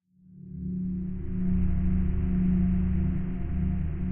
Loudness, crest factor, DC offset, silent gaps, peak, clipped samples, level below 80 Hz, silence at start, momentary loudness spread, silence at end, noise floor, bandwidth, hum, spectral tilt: -29 LUFS; 12 dB; under 0.1%; none; -14 dBFS; under 0.1%; -32 dBFS; 0.3 s; 9 LU; 0 s; -49 dBFS; 3.1 kHz; none; -11.5 dB/octave